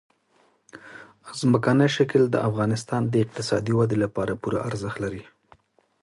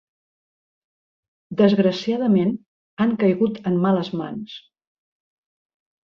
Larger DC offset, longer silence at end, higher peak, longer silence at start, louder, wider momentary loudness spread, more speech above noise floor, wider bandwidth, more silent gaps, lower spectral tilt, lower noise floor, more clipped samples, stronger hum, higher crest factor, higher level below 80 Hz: neither; second, 0.8 s vs 1.45 s; about the same, -6 dBFS vs -4 dBFS; second, 0.75 s vs 1.5 s; second, -24 LUFS vs -21 LUFS; first, 19 LU vs 16 LU; second, 41 dB vs over 70 dB; first, 11.5 kHz vs 6.8 kHz; second, none vs 2.66-2.97 s; second, -6.5 dB/octave vs -8 dB/octave; second, -64 dBFS vs under -90 dBFS; neither; neither; about the same, 20 dB vs 20 dB; first, -56 dBFS vs -64 dBFS